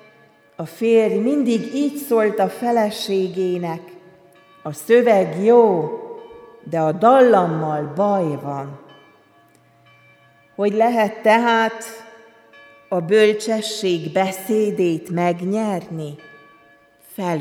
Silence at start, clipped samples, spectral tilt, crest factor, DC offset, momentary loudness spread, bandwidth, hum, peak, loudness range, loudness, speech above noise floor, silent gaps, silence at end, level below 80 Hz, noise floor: 0.6 s; under 0.1%; -5.5 dB/octave; 18 dB; under 0.1%; 19 LU; 18.5 kHz; none; -2 dBFS; 6 LU; -18 LUFS; 36 dB; none; 0 s; -70 dBFS; -54 dBFS